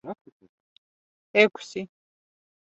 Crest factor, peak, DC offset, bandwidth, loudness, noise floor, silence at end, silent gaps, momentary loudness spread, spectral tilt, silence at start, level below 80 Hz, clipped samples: 26 dB; -4 dBFS; under 0.1%; 8 kHz; -23 LUFS; under -90 dBFS; 0.85 s; 0.21-0.25 s, 0.32-0.40 s, 0.49-1.34 s; 22 LU; -4.5 dB/octave; 0.05 s; -76 dBFS; under 0.1%